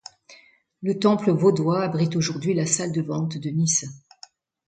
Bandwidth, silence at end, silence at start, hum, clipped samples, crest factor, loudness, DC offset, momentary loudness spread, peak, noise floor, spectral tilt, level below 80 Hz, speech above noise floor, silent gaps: 9.4 kHz; 0.7 s; 0.3 s; none; under 0.1%; 18 dB; -23 LUFS; under 0.1%; 8 LU; -6 dBFS; -54 dBFS; -5 dB/octave; -66 dBFS; 32 dB; none